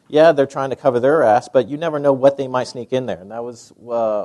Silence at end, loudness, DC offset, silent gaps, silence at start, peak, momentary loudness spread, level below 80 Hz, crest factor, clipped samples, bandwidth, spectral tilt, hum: 0 s; -17 LUFS; under 0.1%; none; 0.1 s; 0 dBFS; 14 LU; -64 dBFS; 16 dB; under 0.1%; 11 kHz; -6 dB/octave; none